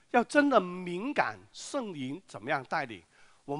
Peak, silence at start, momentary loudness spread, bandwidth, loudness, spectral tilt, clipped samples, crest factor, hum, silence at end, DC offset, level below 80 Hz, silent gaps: -8 dBFS; 0.15 s; 16 LU; 11 kHz; -31 LUFS; -5 dB/octave; under 0.1%; 22 dB; none; 0 s; under 0.1%; -72 dBFS; none